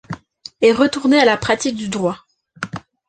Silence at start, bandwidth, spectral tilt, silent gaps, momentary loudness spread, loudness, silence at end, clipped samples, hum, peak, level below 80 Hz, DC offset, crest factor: 0.1 s; 9.4 kHz; -4.5 dB/octave; none; 19 LU; -16 LUFS; 0.3 s; under 0.1%; none; -2 dBFS; -52 dBFS; under 0.1%; 16 dB